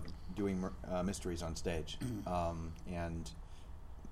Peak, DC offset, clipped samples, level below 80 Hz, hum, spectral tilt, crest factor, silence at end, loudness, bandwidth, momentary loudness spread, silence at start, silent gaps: -24 dBFS; under 0.1%; under 0.1%; -50 dBFS; none; -6 dB/octave; 16 dB; 0 s; -41 LUFS; 15.5 kHz; 16 LU; 0 s; none